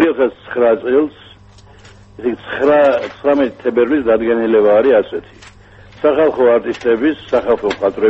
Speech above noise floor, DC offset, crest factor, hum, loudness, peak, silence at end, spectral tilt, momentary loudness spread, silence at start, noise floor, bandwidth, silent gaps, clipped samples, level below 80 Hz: 28 dB; under 0.1%; 14 dB; none; -14 LUFS; 0 dBFS; 0 s; -6.5 dB/octave; 9 LU; 0 s; -42 dBFS; 8 kHz; none; under 0.1%; -48 dBFS